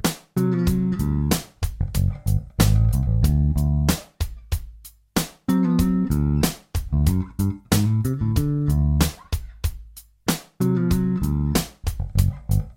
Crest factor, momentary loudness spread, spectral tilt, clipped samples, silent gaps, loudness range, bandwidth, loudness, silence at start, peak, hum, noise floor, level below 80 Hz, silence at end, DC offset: 18 dB; 11 LU; -6 dB/octave; under 0.1%; none; 2 LU; 17 kHz; -23 LUFS; 0.05 s; -2 dBFS; none; -44 dBFS; -28 dBFS; 0.05 s; under 0.1%